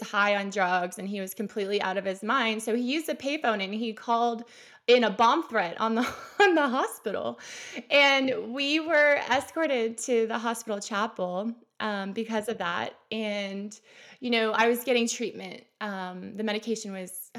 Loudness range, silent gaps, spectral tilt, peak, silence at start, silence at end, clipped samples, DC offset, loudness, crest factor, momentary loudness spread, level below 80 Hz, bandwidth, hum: 6 LU; none; -3.5 dB/octave; -10 dBFS; 0 s; 0 s; under 0.1%; under 0.1%; -27 LUFS; 18 dB; 14 LU; -78 dBFS; 16 kHz; none